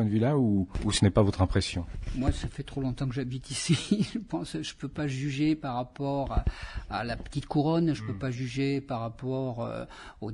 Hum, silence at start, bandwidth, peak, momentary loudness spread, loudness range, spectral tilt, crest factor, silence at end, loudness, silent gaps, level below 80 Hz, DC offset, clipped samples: none; 0 s; 11 kHz; -10 dBFS; 11 LU; 3 LU; -6 dB/octave; 18 dB; 0 s; -30 LUFS; none; -42 dBFS; under 0.1%; under 0.1%